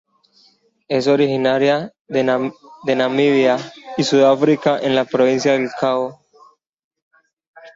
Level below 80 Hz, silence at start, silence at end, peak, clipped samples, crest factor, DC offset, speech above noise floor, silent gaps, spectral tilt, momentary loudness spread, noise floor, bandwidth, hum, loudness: -64 dBFS; 0.9 s; 0.05 s; -2 dBFS; under 0.1%; 16 dB; under 0.1%; 40 dB; 2.01-2.05 s, 6.69-6.73 s, 6.79-6.91 s, 7.02-7.11 s, 7.33-7.37 s, 7.47-7.54 s; -5.5 dB/octave; 9 LU; -56 dBFS; 7.8 kHz; none; -17 LUFS